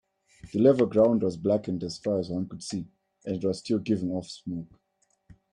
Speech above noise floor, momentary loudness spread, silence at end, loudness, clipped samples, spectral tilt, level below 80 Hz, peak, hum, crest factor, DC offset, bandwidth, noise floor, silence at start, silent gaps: 44 dB; 15 LU; 0.9 s; -27 LUFS; under 0.1%; -7 dB/octave; -62 dBFS; -8 dBFS; none; 20 dB; under 0.1%; 10.5 kHz; -70 dBFS; 0.45 s; none